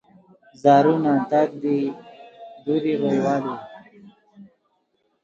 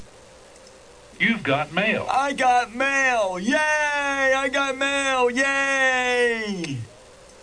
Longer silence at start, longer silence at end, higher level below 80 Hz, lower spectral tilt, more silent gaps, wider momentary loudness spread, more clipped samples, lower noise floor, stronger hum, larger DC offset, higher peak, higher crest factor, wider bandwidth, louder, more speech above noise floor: first, 0.65 s vs 0 s; first, 0.8 s vs 0.55 s; second, -70 dBFS vs -56 dBFS; first, -7.5 dB/octave vs -3.5 dB/octave; neither; first, 23 LU vs 4 LU; neither; first, -69 dBFS vs -47 dBFS; neither; neither; first, -2 dBFS vs -6 dBFS; about the same, 20 dB vs 16 dB; second, 7.6 kHz vs 10.5 kHz; about the same, -21 LUFS vs -21 LUFS; first, 50 dB vs 26 dB